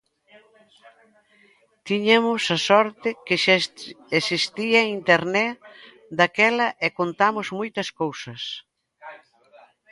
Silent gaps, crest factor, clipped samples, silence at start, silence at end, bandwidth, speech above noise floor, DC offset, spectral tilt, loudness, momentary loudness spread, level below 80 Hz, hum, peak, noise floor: none; 22 dB; under 0.1%; 1.85 s; 0.75 s; 11.5 kHz; 37 dB; under 0.1%; -4 dB/octave; -21 LUFS; 14 LU; -70 dBFS; none; -2 dBFS; -59 dBFS